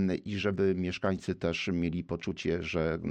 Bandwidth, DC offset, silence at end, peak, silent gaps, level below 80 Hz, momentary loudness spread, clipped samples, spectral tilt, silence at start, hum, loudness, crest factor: 9 kHz; under 0.1%; 0 s; -16 dBFS; none; -52 dBFS; 4 LU; under 0.1%; -6.5 dB/octave; 0 s; none; -32 LUFS; 16 dB